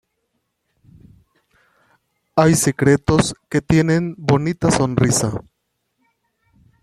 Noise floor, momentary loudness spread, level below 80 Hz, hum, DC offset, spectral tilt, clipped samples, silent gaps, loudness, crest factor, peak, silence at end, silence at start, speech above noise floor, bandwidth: -72 dBFS; 7 LU; -44 dBFS; none; under 0.1%; -5.5 dB/octave; under 0.1%; none; -17 LUFS; 18 dB; 0 dBFS; 1.4 s; 2.35 s; 56 dB; 14 kHz